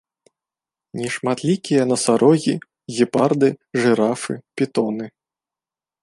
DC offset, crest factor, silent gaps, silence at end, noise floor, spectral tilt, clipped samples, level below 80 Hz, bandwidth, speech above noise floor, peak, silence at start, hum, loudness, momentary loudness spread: under 0.1%; 18 dB; none; 0.95 s; under -90 dBFS; -5.5 dB/octave; under 0.1%; -66 dBFS; 11.5 kHz; over 71 dB; -2 dBFS; 0.95 s; none; -20 LUFS; 13 LU